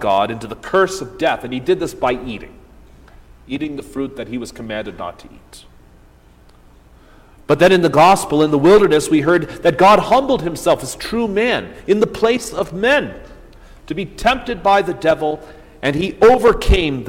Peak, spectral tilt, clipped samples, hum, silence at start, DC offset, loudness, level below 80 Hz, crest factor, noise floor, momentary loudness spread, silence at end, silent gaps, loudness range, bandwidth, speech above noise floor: -2 dBFS; -5 dB/octave; under 0.1%; none; 0 s; under 0.1%; -16 LUFS; -32 dBFS; 14 dB; -47 dBFS; 16 LU; 0 s; none; 15 LU; 16.5 kHz; 31 dB